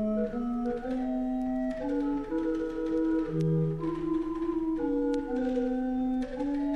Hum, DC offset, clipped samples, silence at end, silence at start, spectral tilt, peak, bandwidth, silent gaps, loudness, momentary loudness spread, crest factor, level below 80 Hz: none; under 0.1%; under 0.1%; 0 s; 0 s; -9 dB/octave; -18 dBFS; 8.4 kHz; none; -31 LUFS; 3 LU; 12 dB; -46 dBFS